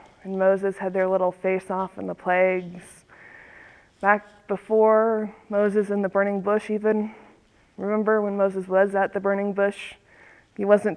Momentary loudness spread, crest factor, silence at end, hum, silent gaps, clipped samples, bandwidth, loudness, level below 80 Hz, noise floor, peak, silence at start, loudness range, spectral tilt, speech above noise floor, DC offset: 11 LU; 20 dB; 0 s; none; none; under 0.1%; 11 kHz; -23 LUFS; -66 dBFS; -57 dBFS; -4 dBFS; 0.25 s; 3 LU; -7.5 dB/octave; 34 dB; under 0.1%